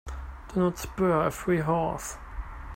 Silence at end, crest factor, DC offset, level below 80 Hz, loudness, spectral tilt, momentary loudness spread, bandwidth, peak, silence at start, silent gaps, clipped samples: 0 s; 16 dB; under 0.1%; -42 dBFS; -28 LUFS; -6.5 dB/octave; 16 LU; 16.5 kHz; -12 dBFS; 0.05 s; none; under 0.1%